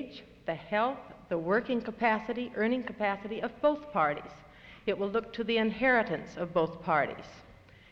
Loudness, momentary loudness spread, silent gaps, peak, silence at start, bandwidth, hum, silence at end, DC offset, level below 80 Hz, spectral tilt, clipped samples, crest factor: -31 LUFS; 12 LU; none; -14 dBFS; 0 s; 7.2 kHz; none; 0.4 s; under 0.1%; -62 dBFS; -7 dB/octave; under 0.1%; 18 dB